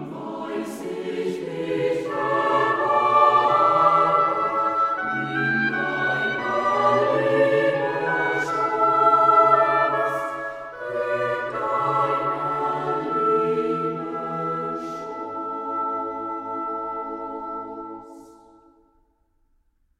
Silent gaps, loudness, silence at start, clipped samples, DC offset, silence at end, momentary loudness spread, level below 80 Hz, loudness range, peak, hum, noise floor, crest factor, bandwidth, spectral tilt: none; -22 LUFS; 0 s; under 0.1%; under 0.1%; 1.7 s; 14 LU; -62 dBFS; 11 LU; -4 dBFS; none; -65 dBFS; 18 dB; 13.5 kHz; -6 dB/octave